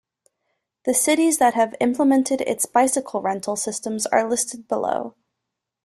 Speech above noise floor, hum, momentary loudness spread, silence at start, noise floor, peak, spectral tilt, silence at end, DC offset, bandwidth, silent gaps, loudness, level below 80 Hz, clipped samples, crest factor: 61 dB; none; 8 LU; 0.85 s; -82 dBFS; -4 dBFS; -3 dB/octave; 0.75 s; under 0.1%; 15 kHz; none; -21 LUFS; -66 dBFS; under 0.1%; 18 dB